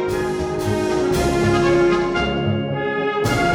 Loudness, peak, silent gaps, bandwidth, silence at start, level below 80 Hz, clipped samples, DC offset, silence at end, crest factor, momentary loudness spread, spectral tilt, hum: -19 LUFS; -6 dBFS; none; 16.5 kHz; 0 s; -36 dBFS; under 0.1%; under 0.1%; 0 s; 12 dB; 6 LU; -6 dB/octave; none